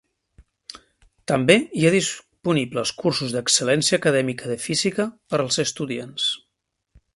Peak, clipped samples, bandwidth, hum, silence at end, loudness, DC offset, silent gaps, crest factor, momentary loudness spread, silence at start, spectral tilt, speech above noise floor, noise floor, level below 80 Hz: -2 dBFS; under 0.1%; 11.5 kHz; none; 0.8 s; -21 LUFS; under 0.1%; none; 22 dB; 12 LU; 0.75 s; -3.5 dB/octave; 56 dB; -78 dBFS; -60 dBFS